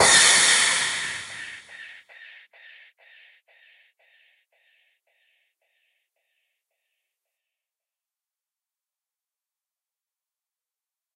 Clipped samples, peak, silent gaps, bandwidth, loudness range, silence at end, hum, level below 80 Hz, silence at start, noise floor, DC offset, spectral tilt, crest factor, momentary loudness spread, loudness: under 0.1%; -4 dBFS; none; 12.5 kHz; 27 LU; 9.25 s; none; -66 dBFS; 0 s; under -90 dBFS; under 0.1%; 1.5 dB/octave; 24 dB; 28 LU; -17 LUFS